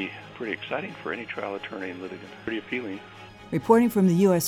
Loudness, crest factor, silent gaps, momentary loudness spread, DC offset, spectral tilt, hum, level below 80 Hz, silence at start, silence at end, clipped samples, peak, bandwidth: -26 LUFS; 20 dB; none; 18 LU; under 0.1%; -6 dB/octave; none; -62 dBFS; 0 s; 0 s; under 0.1%; -6 dBFS; 15.5 kHz